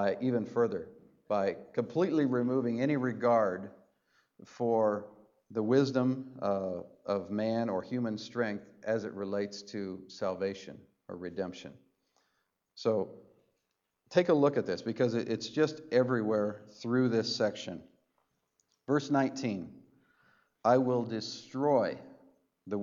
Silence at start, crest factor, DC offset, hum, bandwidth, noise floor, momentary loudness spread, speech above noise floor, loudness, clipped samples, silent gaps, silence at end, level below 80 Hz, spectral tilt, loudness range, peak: 0 s; 20 dB; under 0.1%; none; 7.6 kHz; -83 dBFS; 14 LU; 51 dB; -32 LUFS; under 0.1%; none; 0 s; -78 dBFS; -6.5 dB/octave; 7 LU; -12 dBFS